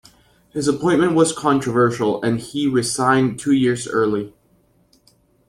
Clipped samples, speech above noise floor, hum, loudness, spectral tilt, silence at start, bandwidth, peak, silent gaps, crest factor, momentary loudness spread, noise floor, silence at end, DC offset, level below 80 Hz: under 0.1%; 41 dB; none; -18 LUFS; -5 dB/octave; 0.55 s; 13.5 kHz; -2 dBFS; none; 18 dB; 6 LU; -58 dBFS; 1.2 s; under 0.1%; -56 dBFS